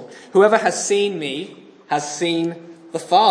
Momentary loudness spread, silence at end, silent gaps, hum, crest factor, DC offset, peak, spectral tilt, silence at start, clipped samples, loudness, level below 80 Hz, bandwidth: 16 LU; 0 s; none; none; 18 dB; under 0.1%; -2 dBFS; -3.5 dB/octave; 0 s; under 0.1%; -19 LUFS; -76 dBFS; 10.5 kHz